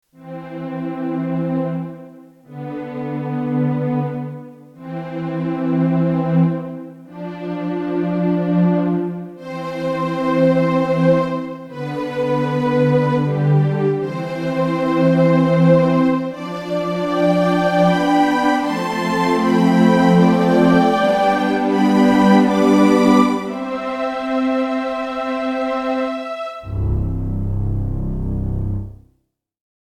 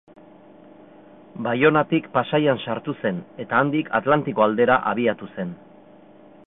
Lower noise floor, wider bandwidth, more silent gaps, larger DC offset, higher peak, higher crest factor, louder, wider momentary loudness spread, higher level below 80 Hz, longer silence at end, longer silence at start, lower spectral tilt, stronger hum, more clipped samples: first, -67 dBFS vs -48 dBFS; first, 12.5 kHz vs 4 kHz; neither; neither; first, 0 dBFS vs -4 dBFS; about the same, 16 dB vs 20 dB; first, -18 LUFS vs -21 LUFS; about the same, 15 LU vs 13 LU; first, -36 dBFS vs -60 dBFS; first, 1.05 s vs 0.9 s; second, 0.2 s vs 1.35 s; second, -7.5 dB/octave vs -11 dB/octave; neither; neither